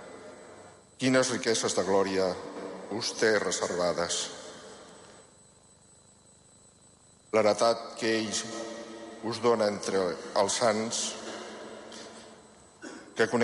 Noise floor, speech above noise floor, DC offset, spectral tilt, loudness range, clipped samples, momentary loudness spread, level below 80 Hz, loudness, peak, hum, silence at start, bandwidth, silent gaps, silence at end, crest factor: -59 dBFS; 31 dB; under 0.1%; -3 dB/octave; 6 LU; under 0.1%; 21 LU; -66 dBFS; -29 LUFS; -12 dBFS; none; 0 s; 11.5 kHz; none; 0 s; 18 dB